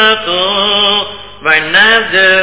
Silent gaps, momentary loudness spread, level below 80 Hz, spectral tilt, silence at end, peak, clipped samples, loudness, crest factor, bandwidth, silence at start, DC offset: none; 7 LU; -44 dBFS; -6 dB/octave; 0 s; 0 dBFS; 0.6%; -8 LUFS; 10 dB; 4 kHz; 0 s; 1%